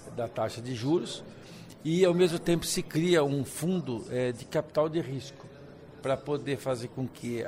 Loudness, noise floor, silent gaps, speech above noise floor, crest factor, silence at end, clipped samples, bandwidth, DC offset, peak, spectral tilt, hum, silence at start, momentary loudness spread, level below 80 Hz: -30 LUFS; -49 dBFS; none; 19 dB; 18 dB; 0 s; under 0.1%; 16 kHz; under 0.1%; -12 dBFS; -5.5 dB/octave; none; 0 s; 20 LU; -58 dBFS